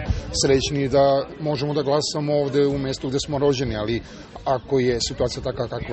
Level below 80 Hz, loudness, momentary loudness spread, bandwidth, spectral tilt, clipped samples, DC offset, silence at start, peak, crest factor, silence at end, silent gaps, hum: -38 dBFS; -22 LUFS; 8 LU; 8.8 kHz; -5 dB/octave; under 0.1%; under 0.1%; 0 s; -6 dBFS; 16 dB; 0 s; none; none